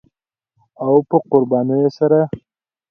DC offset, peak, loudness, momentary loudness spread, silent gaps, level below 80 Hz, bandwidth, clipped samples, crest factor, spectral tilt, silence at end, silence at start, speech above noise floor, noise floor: under 0.1%; 0 dBFS; -16 LUFS; 9 LU; none; -58 dBFS; 6.2 kHz; under 0.1%; 18 dB; -10 dB/octave; 0.5 s; 0.8 s; 58 dB; -73 dBFS